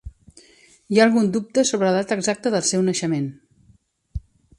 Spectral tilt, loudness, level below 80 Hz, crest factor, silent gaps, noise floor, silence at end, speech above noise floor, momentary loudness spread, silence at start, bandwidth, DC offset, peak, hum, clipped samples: -4.5 dB/octave; -20 LUFS; -46 dBFS; 20 dB; none; -58 dBFS; 0.4 s; 38 dB; 20 LU; 0.05 s; 11.5 kHz; under 0.1%; -2 dBFS; none; under 0.1%